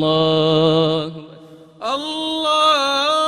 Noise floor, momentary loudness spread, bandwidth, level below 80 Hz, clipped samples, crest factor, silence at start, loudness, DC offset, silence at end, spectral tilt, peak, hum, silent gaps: -42 dBFS; 12 LU; 15.5 kHz; -54 dBFS; under 0.1%; 14 dB; 0 s; -17 LUFS; under 0.1%; 0 s; -5 dB/octave; -4 dBFS; none; none